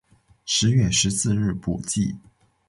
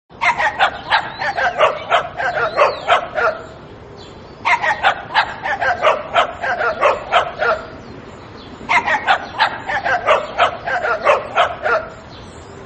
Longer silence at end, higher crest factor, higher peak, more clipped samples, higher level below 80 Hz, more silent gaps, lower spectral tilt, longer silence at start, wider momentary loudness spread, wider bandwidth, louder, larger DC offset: first, 0.5 s vs 0 s; about the same, 16 dB vs 18 dB; second, -8 dBFS vs 0 dBFS; neither; about the same, -44 dBFS vs -48 dBFS; neither; about the same, -4 dB/octave vs -3 dB/octave; first, 0.45 s vs 0.1 s; second, 10 LU vs 20 LU; first, 11.5 kHz vs 8.8 kHz; second, -22 LUFS vs -17 LUFS; neither